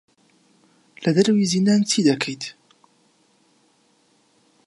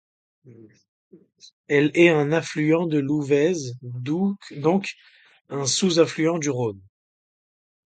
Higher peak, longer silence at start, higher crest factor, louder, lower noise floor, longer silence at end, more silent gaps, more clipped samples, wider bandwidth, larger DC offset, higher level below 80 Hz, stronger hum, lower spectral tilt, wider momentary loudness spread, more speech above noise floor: about the same, -6 dBFS vs -4 dBFS; first, 1 s vs 0.45 s; about the same, 18 dB vs 20 dB; about the same, -20 LUFS vs -22 LUFS; second, -62 dBFS vs under -90 dBFS; first, 2.15 s vs 1.05 s; second, none vs 0.88-1.11 s, 1.53-1.64 s, 5.41-5.45 s; neither; first, 11.5 kHz vs 9.4 kHz; neither; about the same, -70 dBFS vs -68 dBFS; neither; about the same, -5 dB/octave vs -5 dB/octave; about the same, 11 LU vs 12 LU; second, 43 dB vs over 68 dB